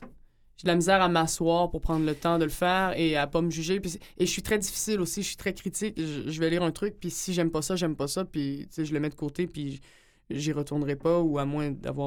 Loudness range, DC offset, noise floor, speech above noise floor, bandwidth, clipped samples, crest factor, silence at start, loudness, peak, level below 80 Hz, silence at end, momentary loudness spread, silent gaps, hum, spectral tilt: 5 LU; under 0.1%; -55 dBFS; 27 dB; 19 kHz; under 0.1%; 20 dB; 0 s; -28 LUFS; -8 dBFS; -46 dBFS; 0 s; 8 LU; none; none; -4.5 dB/octave